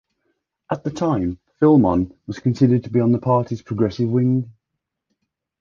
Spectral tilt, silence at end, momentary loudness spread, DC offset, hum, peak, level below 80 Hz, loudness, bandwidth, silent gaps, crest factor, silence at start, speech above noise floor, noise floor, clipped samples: -9 dB/octave; 1.1 s; 11 LU; under 0.1%; none; -4 dBFS; -46 dBFS; -20 LUFS; 7.2 kHz; none; 16 dB; 0.7 s; 62 dB; -80 dBFS; under 0.1%